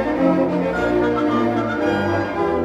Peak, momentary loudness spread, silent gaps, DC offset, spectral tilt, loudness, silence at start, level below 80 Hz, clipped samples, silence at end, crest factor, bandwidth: -4 dBFS; 3 LU; none; under 0.1%; -7.5 dB/octave; -19 LUFS; 0 s; -42 dBFS; under 0.1%; 0 s; 14 dB; 10.5 kHz